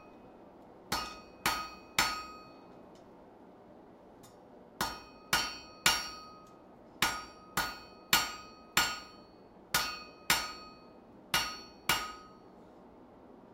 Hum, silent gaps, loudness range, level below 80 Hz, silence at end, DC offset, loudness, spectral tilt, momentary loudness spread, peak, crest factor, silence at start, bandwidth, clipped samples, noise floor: none; none; 6 LU; -60 dBFS; 0 s; under 0.1%; -33 LUFS; -1 dB/octave; 26 LU; -8 dBFS; 30 dB; 0 s; 16 kHz; under 0.1%; -56 dBFS